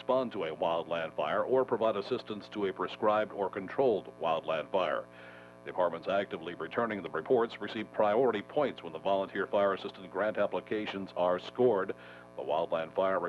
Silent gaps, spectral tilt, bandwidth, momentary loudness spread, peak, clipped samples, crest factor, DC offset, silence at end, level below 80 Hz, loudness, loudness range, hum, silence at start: none; -6.5 dB/octave; 11 kHz; 9 LU; -16 dBFS; under 0.1%; 16 dB; under 0.1%; 0 s; -72 dBFS; -32 LUFS; 2 LU; 60 Hz at -55 dBFS; 0 s